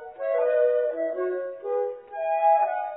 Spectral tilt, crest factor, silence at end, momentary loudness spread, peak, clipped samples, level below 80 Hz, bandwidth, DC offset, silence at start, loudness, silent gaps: -7.5 dB/octave; 14 dB; 0 s; 9 LU; -12 dBFS; under 0.1%; -76 dBFS; 4 kHz; under 0.1%; 0 s; -25 LUFS; none